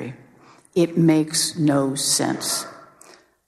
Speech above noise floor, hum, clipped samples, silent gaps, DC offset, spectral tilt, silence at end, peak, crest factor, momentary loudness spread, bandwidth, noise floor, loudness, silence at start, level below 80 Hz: 32 dB; none; under 0.1%; none; under 0.1%; -4 dB/octave; 0.65 s; -6 dBFS; 16 dB; 9 LU; 14 kHz; -51 dBFS; -20 LUFS; 0 s; -62 dBFS